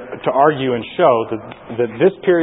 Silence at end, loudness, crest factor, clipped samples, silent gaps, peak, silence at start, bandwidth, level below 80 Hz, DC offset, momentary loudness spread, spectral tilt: 0 s; -16 LUFS; 16 dB; under 0.1%; none; 0 dBFS; 0 s; 4 kHz; -56 dBFS; under 0.1%; 11 LU; -11.5 dB/octave